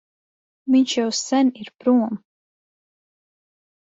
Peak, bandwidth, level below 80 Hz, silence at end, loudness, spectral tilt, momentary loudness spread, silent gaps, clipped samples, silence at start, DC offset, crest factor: -6 dBFS; 8 kHz; -72 dBFS; 1.8 s; -20 LUFS; -3.5 dB/octave; 11 LU; none; under 0.1%; 0.65 s; under 0.1%; 16 dB